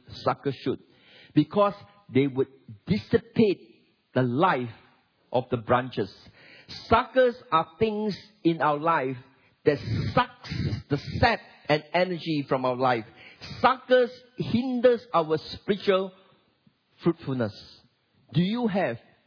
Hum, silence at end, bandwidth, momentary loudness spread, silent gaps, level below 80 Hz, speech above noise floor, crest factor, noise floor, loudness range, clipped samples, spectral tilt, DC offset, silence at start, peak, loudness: none; 0.3 s; 5.4 kHz; 10 LU; none; -54 dBFS; 40 dB; 20 dB; -66 dBFS; 3 LU; under 0.1%; -8 dB/octave; under 0.1%; 0.1 s; -6 dBFS; -26 LUFS